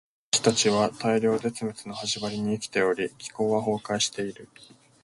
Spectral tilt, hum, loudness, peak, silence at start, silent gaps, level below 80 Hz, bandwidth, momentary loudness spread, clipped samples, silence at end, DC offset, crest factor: -3.5 dB/octave; none; -26 LUFS; -6 dBFS; 0.35 s; none; -64 dBFS; 11.5 kHz; 11 LU; under 0.1%; 0.6 s; under 0.1%; 22 dB